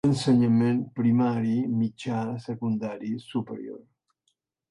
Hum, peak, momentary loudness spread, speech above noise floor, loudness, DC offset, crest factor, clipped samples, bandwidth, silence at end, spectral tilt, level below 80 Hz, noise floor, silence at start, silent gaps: none; -12 dBFS; 13 LU; 51 dB; -26 LUFS; under 0.1%; 14 dB; under 0.1%; 11 kHz; 0.9 s; -7.5 dB/octave; -64 dBFS; -76 dBFS; 0.05 s; none